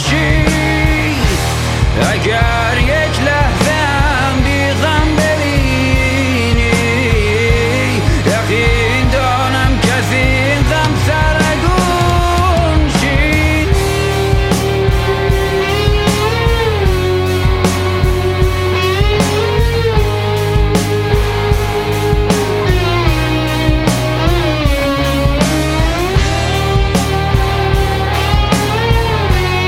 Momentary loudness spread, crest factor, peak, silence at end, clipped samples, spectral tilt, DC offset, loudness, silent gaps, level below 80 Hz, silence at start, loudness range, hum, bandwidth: 2 LU; 12 dB; 0 dBFS; 0 s; under 0.1%; -5.5 dB/octave; under 0.1%; -13 LUFS; none; -18 dBFS; 0 s; 1 LU; none; 16.5 kHz